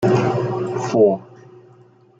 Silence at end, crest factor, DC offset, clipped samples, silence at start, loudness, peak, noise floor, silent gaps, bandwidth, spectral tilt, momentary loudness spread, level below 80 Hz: 0.95 s; 16 dB; under 0.1%; under 0.1%; 0 s; -19 LUFS; -4 dBFS; -50 dBFS; none; 8 kHz; -7.5 dB/octave; 7 LU; -58 dBFS